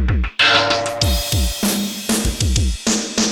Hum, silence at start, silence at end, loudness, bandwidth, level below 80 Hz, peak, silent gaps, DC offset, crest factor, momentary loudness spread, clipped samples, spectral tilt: none; 0 s; 0 s; -17 LUFS; 18.5 kHz; -24 dBFS; -2 dBFS; none; under 0.1%; 16 dB; 7 LU; under 0.1%; -3 dB/octave